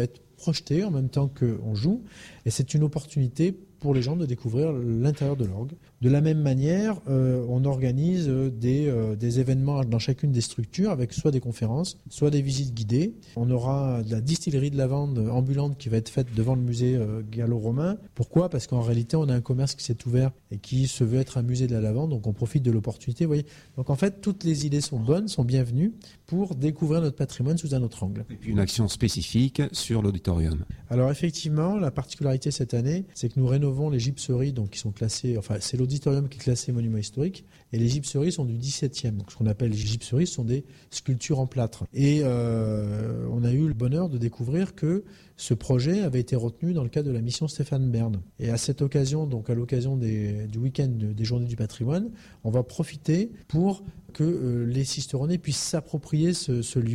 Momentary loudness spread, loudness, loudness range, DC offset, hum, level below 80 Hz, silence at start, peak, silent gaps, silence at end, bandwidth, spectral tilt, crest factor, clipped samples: 6 LU; -26 LUFS; 3 LU; under 0.1%; none; -48 dBFS; 0 s; -10 dBFS; none; 0 s; 12 kHz; -6.5 dB/octave; 16 dB; under 0.1%